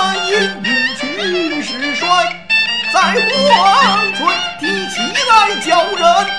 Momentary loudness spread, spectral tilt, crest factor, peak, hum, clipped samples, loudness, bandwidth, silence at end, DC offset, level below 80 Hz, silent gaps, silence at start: 7 LU; -2.5 dB/octave; 14 dB; 0 dBFS; 50 Hz at -45 dBFS; under 0.1%; -13 LUFS; 11 kHz; 0 s; 0.8%; -52 dBFS; none; 0 s